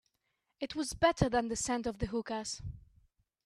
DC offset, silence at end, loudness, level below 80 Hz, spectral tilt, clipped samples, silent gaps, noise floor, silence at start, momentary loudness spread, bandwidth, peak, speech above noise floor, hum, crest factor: under 0.1%; 0.65 s; -34 LUFS; -52 dBFS; -4.5 dB/octave; under 0.1%; none; -82 dBFS; 0.6 s; 13 LU; 13.5 kHz; -14 dBFS; 48 dB; none; 22 dB